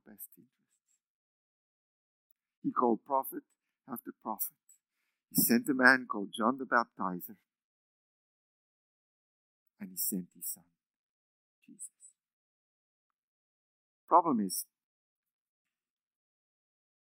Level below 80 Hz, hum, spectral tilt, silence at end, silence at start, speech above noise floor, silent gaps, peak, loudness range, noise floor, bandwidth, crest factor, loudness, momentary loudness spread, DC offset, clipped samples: -88 dBFS; none; -3.5 dB/octave; 2.4 s; 0.1 s; 54 dB; 1.07-2.36 s, 2.57-2.62 s, 7.64-9.66 s, 10.96-11.62 s, 12.33-13.10 s, 13.18-14.08 s; -6 dBFS; 12 LU; -86 dBFS; 16 kHz; 30 dB; -31 LUFS; 22 LU; under 0.1%; under 0.1%